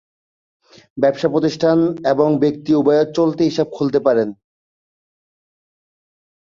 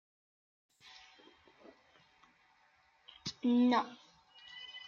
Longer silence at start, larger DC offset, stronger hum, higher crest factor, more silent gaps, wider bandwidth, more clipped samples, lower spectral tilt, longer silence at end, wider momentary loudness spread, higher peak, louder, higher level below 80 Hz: second, 0.95 s vs 3.25 s; neither; neither; second, 16 dB vs 22 dB; neither; about the same, 7.4 kHz vs 7.2 kHz; neither; first, -7 dB/octave vs -4.5 dB/octave; first, 2.25 s vs 0.05 s; second, 4 LU vs 28 LU; first, -2 dBFS vs -18 dBFS; first, -17 LUFS vs -33 LUFS; first, -60 dBFS vs -80 dBFS